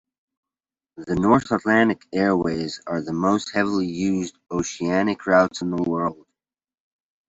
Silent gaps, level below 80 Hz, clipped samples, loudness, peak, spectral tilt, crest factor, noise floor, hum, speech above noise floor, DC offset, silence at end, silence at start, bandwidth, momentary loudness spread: none; -56 dBFS; under 0.1%; -22 LUFS; -4 dBFS; -5.5 dB/octave; 20 dB; under -90 dBFS; none; over 69 dB; under 0.1%; 1.15 s; 0.95 s; 8 kHz; 9 LU